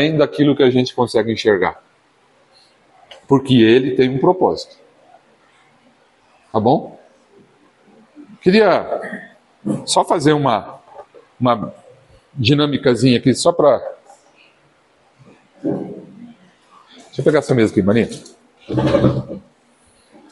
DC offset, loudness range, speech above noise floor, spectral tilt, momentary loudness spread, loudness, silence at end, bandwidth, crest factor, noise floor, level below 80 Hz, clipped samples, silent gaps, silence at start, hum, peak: under 0.1%; 8 LU; 41 dB; -6 dB/octave; 18 LU; -16 LUFS; 0.9 s; 11.5 kHz; 18 dB; -56 dBFS; -52 dBFS; under 0.1%; none; 0 s; none; 0 dBFS